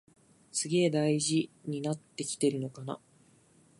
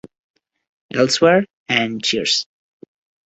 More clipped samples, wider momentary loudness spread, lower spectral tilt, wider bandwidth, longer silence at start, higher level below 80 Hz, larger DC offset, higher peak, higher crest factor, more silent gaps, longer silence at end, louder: neither; first, 12 LU vs 7 LU; about the same, -4.5 dB/octave vs -3.5 dB/octave; first, 11.5 kHz vs 8.2 kHz; second, 0.55 s vs 0.95 s; second, -78 dBFS vs -60 dBFS; neither; second, -16 dBFS vs -2 dBFS; about the same, 18 dB vs 20 dB; second, none vs 1.53-1.66 s; about the same, 0.85 s vs 0.8 s; second, -31 LUFS vs -17 LUFS